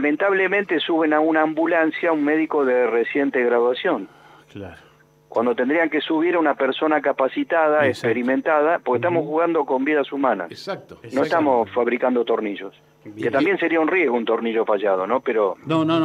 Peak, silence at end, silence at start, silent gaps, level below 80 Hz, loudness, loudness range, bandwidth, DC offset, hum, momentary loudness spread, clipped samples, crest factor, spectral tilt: -4 dBFS; 0 s; 0 s; none; -70 dBFS; -20 LUFS; 3 LU; 9.8 kHz; under 0.1%; none; 9 LU; under 0.1%; 16 dB; -6.5 dB/octave